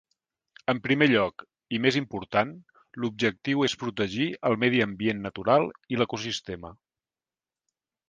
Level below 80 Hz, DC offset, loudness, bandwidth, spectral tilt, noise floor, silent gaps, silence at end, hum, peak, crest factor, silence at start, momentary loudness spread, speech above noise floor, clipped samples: -62 dBFS; under 0.1%; -26 LUFS; 9.6 kHz; -5.5 dB/octave; under -90 dBFS; none; 1.35 s; none; -6 dBFS; 22 dB; 0.7 s; 11 LU; over 64 dB; under 0.1%